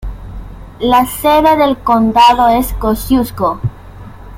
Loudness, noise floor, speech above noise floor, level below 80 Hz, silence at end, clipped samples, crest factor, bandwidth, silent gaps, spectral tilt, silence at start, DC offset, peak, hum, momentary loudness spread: -11 LUFS; -32 dBFS; 21 dB; -28 dBFS; 0 s; under 0.1%; 12 dB; 16.5 kHz; none; -5.5 dB/octave; 0 s; under 0.1%; 0 dBFS; none; 18 LU